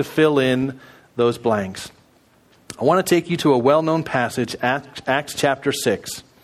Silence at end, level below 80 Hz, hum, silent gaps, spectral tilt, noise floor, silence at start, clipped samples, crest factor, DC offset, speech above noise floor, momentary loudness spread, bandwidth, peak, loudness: 0.2 s; -58 dBFS; none; none; -5 dB/octave; -55 dBFS; 0 s; under 0.1%; 18 dB; under 0.1%; 36 dB; 13 LU; 15 kHz; -2 dBFS; -20 LUFS